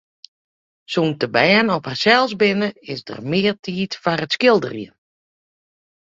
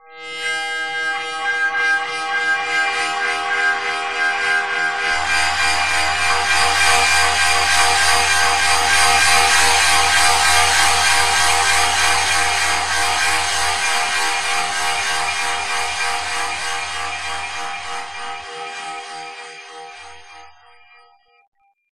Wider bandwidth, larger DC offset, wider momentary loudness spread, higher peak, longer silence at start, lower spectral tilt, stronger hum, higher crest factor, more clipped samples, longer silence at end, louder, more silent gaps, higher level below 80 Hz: second, 7.8 kHz vs 15.5 kHz; second, under 0.1% vs 3%; about the same, 15 LU vs 15 LU; about the same, -2 dBFS vs 0 dBFS; first, 0.9 s vs 0 s; first, -5.5 dB/octave vs 0.5 dB/octave; neither; about the same, 20 dB vs 18 dB; neither; first, 1.25 s vs 0.1 s; about the same, -18 LUFS vs -16 LUFS; about the same, 3.59-3.63 s vs 21.47-21.52 s; second, -62 dBFS vs -44 dBFS